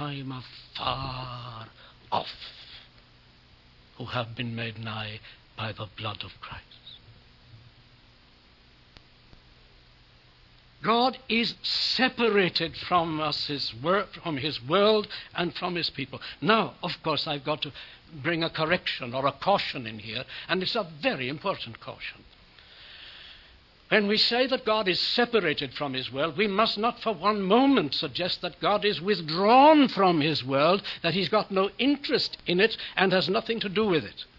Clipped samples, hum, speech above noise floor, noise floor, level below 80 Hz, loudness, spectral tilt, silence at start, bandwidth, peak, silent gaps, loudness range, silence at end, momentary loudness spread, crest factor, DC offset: under 0.1%; none; 30 dB; -57 dBFS; -60 dBFS; -26 LUFS; -6 dB/octave; 0 s; 6 kHz; -4 dBFS; none; 14 LU; 0.15 s; 17 LU; 22 dB; under 0.1%